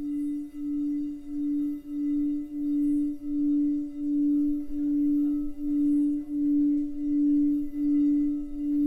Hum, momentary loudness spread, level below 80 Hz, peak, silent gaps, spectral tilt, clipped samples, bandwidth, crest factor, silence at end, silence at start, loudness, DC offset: none; 7 LU; -48 dBFS; -18 dBFS; none; -8.5 dB/octave; under 0.1%; 2.1 kHz; 8 dB; 0 s; 0 s; -27 LUFS; under 0.1%